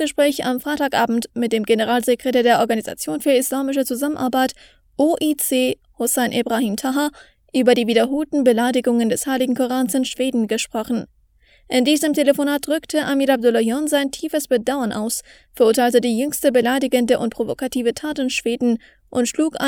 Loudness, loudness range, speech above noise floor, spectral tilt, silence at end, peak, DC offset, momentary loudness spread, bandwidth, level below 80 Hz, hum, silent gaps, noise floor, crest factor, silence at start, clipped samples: -19 LUFS; 2 LU; 36 dB; -3.5 dB/octave; 0 s; -2 dBFS; under 0.1%; 7 LU; 19.5 kHz; -56 dBFS; none; none; -55 dBFS; 18 dB; 0 s; under 0.1%